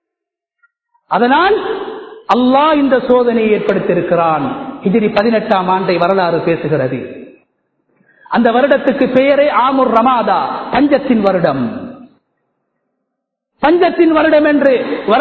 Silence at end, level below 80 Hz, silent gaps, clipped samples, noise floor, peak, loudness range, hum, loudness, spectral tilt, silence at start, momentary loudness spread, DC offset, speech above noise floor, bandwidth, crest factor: 0 s; -48 dBFS; none; under 0.1%; -81 dBFS; 0 dBFS; 4 LU; none; -12 LUFS; -8.5 dB/octave; 1.1 s; 9 LU; under 0.1%; 69 dB; 6.2 kHz; 14 dB